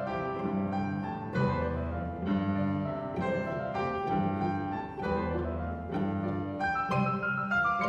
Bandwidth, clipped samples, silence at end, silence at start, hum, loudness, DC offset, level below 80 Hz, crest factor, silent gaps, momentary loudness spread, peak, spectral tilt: 8 kHz; under 0.1%; 0 s; 0 s; none; -32 LUFS; under 0.1%; -48 dBFS; 16 dB; none; 5 LU; -16 dBFS; -8.5 dB/octave